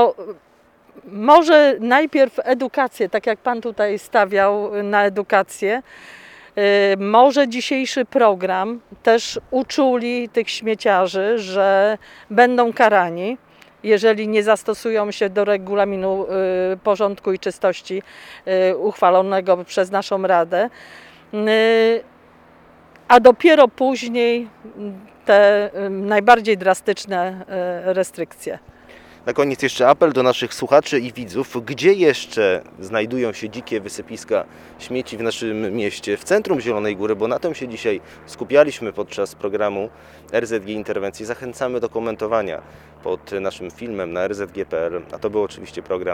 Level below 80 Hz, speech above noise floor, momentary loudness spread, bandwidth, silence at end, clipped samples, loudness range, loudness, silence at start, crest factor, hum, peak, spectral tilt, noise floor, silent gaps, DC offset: -58 dBFS; 30 dB; 14 LU; 16 kHz; 0 s; under 0.1%; 8 LU; -18 LUFS; 0 s; 18 dB; none; 0 dBFS; -4.5 dB/octave; -49 dBFS; none; under 0.1%